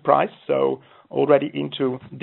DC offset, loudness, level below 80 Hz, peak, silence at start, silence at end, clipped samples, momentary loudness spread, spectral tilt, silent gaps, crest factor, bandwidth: under 0.1%; -22 LUFS; -68 dBFS; -2 dBFS; 0.05 s; 0 s; under 0.1%; 9 LU; -4.5 dB/octave; none; 20 dB; 4.2 kHz